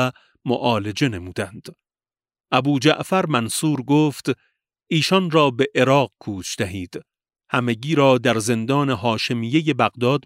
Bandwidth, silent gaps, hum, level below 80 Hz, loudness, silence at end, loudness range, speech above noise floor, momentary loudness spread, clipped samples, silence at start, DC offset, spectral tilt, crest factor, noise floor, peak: 16 kHz; none; none; -60 dBFS; -20 LUFS; 0.05 s; 2 LU; over 70 dB; 13 LU; under 0.1%; 0 s; under 0.1%; -5 dB/octave; 18 dB; under -90 dBFS; -2 dBFS